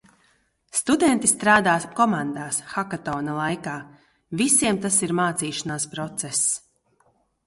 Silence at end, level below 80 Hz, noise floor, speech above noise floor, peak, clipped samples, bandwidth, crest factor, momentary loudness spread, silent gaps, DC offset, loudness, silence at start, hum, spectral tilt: 0.9 s; -60 dBFS; -65 dBFS; 42 dB; -4 dBFS; under 0.1%; 12 kHz; 20 dB; 11 LU; none; under 0.1%; -22 LUFS; 0.75 s; none; -3 dB/octave